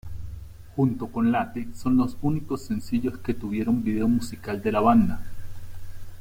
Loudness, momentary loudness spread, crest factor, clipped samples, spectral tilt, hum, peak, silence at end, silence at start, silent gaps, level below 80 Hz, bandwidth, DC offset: -25 LUFS; 22 LU; 18 dB; under 0.1%; -7.5 dB/octave; none; -8 dBFS; 0 s; 0.05 s; none; -42 dBFS; 16 kHz; under 0.1%